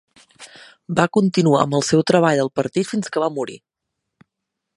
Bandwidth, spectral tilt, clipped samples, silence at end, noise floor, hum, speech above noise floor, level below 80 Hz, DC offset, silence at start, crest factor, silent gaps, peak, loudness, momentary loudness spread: 11.5 kHz; -5.5 dB/octave; under 0.1%; 1.2 s; -80 dBFS; none; 62 dB; -60 dBFS; under 0.1%; 0.4 s; 20 dB; none; 0 dBFS; -18 LUFS; 8 LU